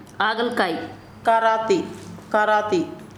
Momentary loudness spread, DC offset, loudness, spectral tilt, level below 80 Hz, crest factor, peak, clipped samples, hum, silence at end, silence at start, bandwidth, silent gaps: 13 LU; under 0.1%; -21 LUFS; -4.5 dB/octave; -60 dBFS; 16 dB; -6 dBFS; under 0.1%; none; 0 s; 0 s; 13.5 kHz; none